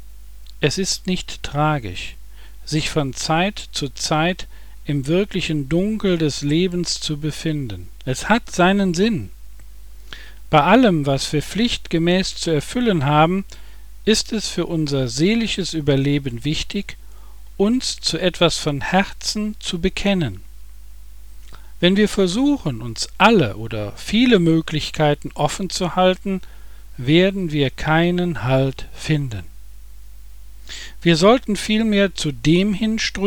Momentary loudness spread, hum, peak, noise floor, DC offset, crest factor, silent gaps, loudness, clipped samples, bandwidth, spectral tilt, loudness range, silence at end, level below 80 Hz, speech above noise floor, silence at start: 12 LU; none; 0 dBFS; -40 dBFS; 2%; 20 dB; none; -19 LUFS; under 0.1%; 18.5 kHz; -5 dB/octave; 4 LU; 0 s; -38 dBFS; 22 dB; 0 s